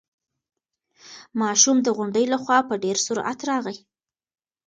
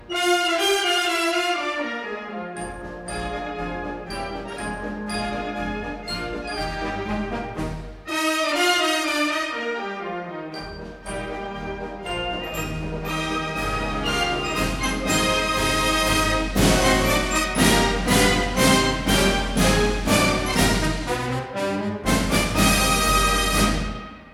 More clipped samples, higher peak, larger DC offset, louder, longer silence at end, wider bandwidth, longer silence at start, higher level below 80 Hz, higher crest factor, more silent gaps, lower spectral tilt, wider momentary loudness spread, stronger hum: neither; about the same, -2 dBFS vs -4 dBFS; neither; about the same, -21 LUFS vs -22 LUFS; first, 0.9 s vs 0 s; second, 10 kHz vs 18.5 kHz; first, 1.05 s vs 0 s; second, -72 dBFS vs -32 dBFS; first, 24 dB vs 18 dB; neither; second, -2 dB/octave vs -3.5 dB/octave; about the same, 12 LU vs 13 LU; neither